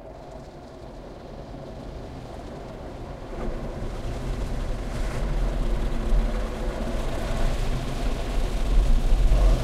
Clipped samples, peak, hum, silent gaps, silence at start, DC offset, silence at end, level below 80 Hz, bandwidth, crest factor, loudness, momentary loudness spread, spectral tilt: under 0.1%; -8 dBFS; none; none; 0 s; under 0.1%; 0 s; -26 dBFS; 12 kHz; 16 dB; -30 LUFS; 16 LU; -6 dB/octave